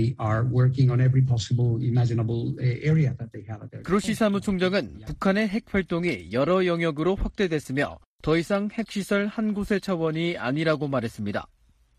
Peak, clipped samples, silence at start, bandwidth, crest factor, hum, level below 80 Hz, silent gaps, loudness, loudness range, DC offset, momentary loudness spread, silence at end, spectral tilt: -8 dBFS; under 0.1%; 0 s; 13 kHz; 16 dB; none; -46 dBFS; 8.06-8.19 s; -25 LUFS; 3 LU; under 0.1%; 9 LU; 0.55 s; -7 dB/octave